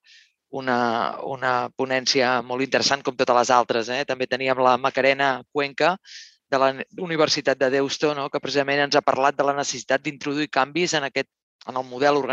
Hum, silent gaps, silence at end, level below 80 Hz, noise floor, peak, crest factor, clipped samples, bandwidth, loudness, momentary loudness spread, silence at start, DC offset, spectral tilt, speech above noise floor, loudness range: none; 11.43-11.59 s; 0 s; -72 dBFS; -55 dBFS; -2 dBFS; 20 dB; under 0.1%; 8.6 kHz; -22 LUFS; 9 LU; 0.55 s; under 0.1%; -3.5 dB/octave; 33 dB; 2 LU